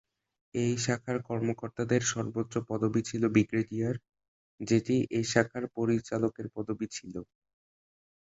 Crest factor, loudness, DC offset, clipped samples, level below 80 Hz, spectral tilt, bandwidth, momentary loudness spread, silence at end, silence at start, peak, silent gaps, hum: 22 dB; -31 LUFS; under 0.1%; under 0.1%; -64 dBFS; -5.5 dB/octave; 8 kHz; 11 LU; 1.05 s; 0.55 s; -8 dBFS; 4.28-4.58 s; none